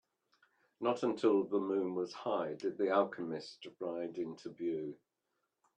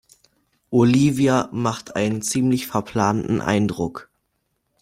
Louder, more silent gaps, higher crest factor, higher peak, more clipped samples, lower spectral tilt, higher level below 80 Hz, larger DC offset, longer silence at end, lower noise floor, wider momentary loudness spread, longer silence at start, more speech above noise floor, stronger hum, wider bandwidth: second, -36 LUFS vs -21 LUFS; neither; about the same, 20 dB vs 18 dB; second, -18 dBFS vs -4 dBFS; neither; about the same, -6.5 dB/octave vs -6 dB/octave; second, -84 dBFS vs -54 dBFS; neither; about the same, 0.85 s vs 0.8 s; first, -85 dBFS vs -72 dBFS; first, 11 LU vs 8 LU; about the same, 0.8 s vs 0.7 s; second, 49 dB vs 53 dB; neither; second, 9.2 kHz vs 16 kHz